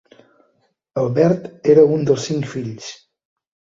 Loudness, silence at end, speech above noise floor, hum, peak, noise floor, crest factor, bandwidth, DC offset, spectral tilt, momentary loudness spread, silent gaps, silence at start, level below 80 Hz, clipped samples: -17 LUFS; 0.85 s; 48 dB; none; -2 dBFS; -65 dBFS; 18 dB; 7.8 kHz; under 0.1%; -7 dB/octave; 17 LU; none; 0.95 s; -60 dBFS; under 0.1%